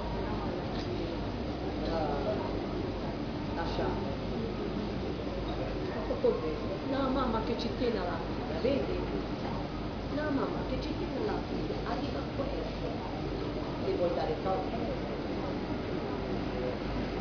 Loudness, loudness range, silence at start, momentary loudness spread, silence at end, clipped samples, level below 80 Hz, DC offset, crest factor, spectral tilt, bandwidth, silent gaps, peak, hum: -34 LUFS; 2 LU; 0 s; 5 LU; 0 s; under 0.1%; -44 dBFS; under 0.1%; 16 dB; -5.5 dB/octave; 5.4 kHz; none; -16 dBFS; none